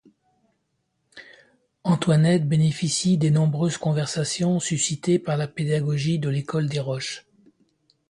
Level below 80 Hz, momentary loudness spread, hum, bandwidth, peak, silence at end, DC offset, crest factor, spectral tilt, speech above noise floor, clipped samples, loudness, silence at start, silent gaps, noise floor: -60 dBFS; 7 LU; none; 11.5 kHz; -8 dBFS; 0.9 s; under 0.1%; 16 dB; -5.5 dB/octave; 52 dB; under 0.1%; -23 LUFS; 1.15 s; none; -74 dBFS